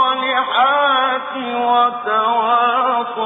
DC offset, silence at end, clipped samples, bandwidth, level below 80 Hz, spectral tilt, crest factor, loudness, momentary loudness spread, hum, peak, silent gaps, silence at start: under 0.1%; 0 s; under 0.1%; 3.9 kHz; -68 dBFS; -5.5 dB/octave; 12 dB; -16 LUFS; 5 LU; none; -4 dBFS; none; 0 s